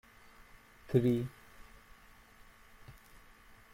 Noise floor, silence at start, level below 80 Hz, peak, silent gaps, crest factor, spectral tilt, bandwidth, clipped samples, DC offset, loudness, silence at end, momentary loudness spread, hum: -59 dBFS; 0.9 s; -62 dBFS; -14 dBFS; none; 24 dB; -8.5 dB/octave; 16.5 kHz; under 0.1%; under 0.1%; -33 LUFS; 0.8 s; 29 LU; none